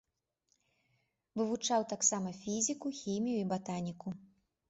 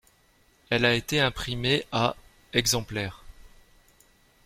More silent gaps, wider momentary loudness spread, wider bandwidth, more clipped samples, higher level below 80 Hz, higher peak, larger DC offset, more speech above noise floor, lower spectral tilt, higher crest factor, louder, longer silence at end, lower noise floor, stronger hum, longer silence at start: neither; first, 13 LU vs 10 LU; second, 8 kHz vs 16.5 kHz; neither; second, -76 dBFS vs -48 dBFS; second, -16 dBFS vs -6 dBFS; neither; first, 45 dB vs 37 dB; first, -5.5 dB/octave vs -3.5 dB/octave; about the same, 22 dB vs 22 dB; second, -35 LUFS vs -26 LUFS; second, 0.45 s vs 1 s; first, -80 dBFS vs -63 dBFS; neither; first, 1.35 s vs 0.7 s